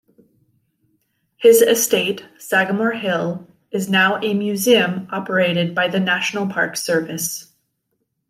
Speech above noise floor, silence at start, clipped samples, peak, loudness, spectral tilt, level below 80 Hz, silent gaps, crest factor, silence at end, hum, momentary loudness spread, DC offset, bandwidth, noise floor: 55 dB; 1.4 s; under 0.1%; -2 dBFS; -18 LUFS; -3.5 dB/octave; -68 dBFS; none; 18 dB; 0.85 s; none; 12 LU; under 0.1%; 16 kHz; -72 dBFS